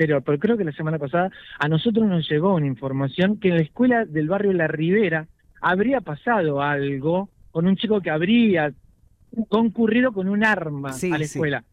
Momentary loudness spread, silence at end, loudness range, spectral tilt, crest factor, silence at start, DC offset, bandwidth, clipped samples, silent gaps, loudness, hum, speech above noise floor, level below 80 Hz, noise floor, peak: 6 LU; 0.1 s; 1 LU; -7 dB/octave; 14 dB; 0 s; under 0.1%; 12.5 kHz; under 0.1%; none; -22 LUFS; none; 28 dB; -56 dBFS; -49 dBFS; -8 dBFS